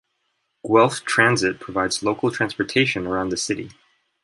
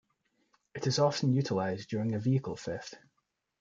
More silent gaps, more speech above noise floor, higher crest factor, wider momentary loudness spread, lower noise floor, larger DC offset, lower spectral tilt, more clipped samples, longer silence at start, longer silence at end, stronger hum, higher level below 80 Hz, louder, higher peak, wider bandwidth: neither; about the same, 52 dB vs 50 dB; about the same, 20 dB vs 18 dB; second, 9 LU vs 13 LU; second, -72 dBFS vs -81 dBFS; neither; second, -4 dB/octave vs -6 dB/octave; neither; about the same, 0.65 s vs 0.75 s; second, 0.5 s vs 0.65 s; neither; first, -54 dBFS vs -70 dBFS; first, -21 LUFS vs -32 LUFS; first, -2 dBFS vs -14 dBFS; first, 11.5 kHz vs 7.6 kHz